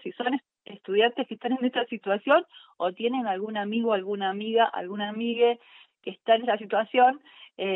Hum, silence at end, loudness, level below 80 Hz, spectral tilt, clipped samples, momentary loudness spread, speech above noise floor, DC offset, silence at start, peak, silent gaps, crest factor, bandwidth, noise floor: none; 0 s; -26 LUFS; -88 dBFS; -8 dB/octave; under 0.1%; 11 LU; 23 dB; under 0.1%; 0.05 s; -10 dBFS; none; 18 dB; 4.1 kHz; -48 dBFS